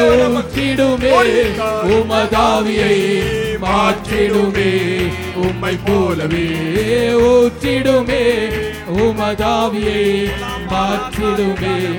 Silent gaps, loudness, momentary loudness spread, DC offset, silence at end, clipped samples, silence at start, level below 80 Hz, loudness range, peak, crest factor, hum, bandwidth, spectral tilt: none; -15 LUFS; 7 LU; under 0.1%; 0 s; under 0.1%; 0 s; -32 dBFS; 3 LU; -2 dBFS; 12 dB; none; 19 kHz; -5.5 dB/octave